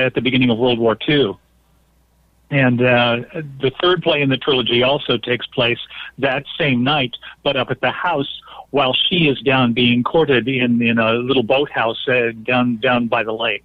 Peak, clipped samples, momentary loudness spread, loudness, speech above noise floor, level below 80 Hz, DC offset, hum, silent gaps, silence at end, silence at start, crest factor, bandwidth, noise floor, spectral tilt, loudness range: -6 dBFS; under 0.1%; 8 LU; -17 LUFS; 40 dB; -50 dBFS; under 0.1%; none; none; 0.05 s; 0 s; 12 dB; 5 kHz; -57 dBFS; -8 dB/octave; 3 LU